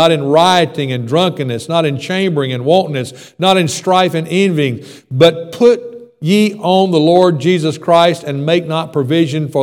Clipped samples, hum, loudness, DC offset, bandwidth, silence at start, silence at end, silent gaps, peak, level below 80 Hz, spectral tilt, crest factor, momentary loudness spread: 0.2%; none; -13 LUFS; under 0.1%; 17 kHz; 0 s; 0 s; none; 0 dBFS; -60 dBFS; -5.5 dB/octave; 12 dB; 8 LU